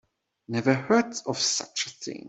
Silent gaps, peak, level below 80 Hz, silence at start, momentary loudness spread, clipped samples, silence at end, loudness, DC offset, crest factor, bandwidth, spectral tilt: none; -6 dBFS; -70 dBFS; 0.5 s; 9 LU; under 0.1%; 0 s; -26 LUFS; under 0.1%; 22 dB; 8.2 kHz; -3.5 dB/octave